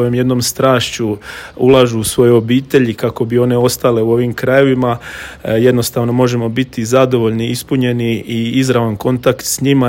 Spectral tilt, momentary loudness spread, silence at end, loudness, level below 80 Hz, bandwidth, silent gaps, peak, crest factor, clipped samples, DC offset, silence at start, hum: -5.5 dB/octave; 7 LU; 0 s; -13 LUFS; -44 dBFS; 17 kHz; none; 0 dBFS; 12 dB; 0.2%; under 0.1%; 0 s; none